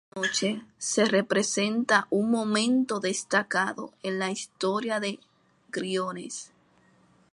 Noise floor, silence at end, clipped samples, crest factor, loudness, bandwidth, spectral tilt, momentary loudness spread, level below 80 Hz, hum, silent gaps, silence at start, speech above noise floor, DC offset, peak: -62 dBFS; 0.85 s; under 0.1%; 20 dB; -27 LUFS; 11.5 kHz; -3.5 dB/octave; 11 LU; -76 dBFS; none; none; 0.15 s; 35 dB; under 0.1%; -8 dBFS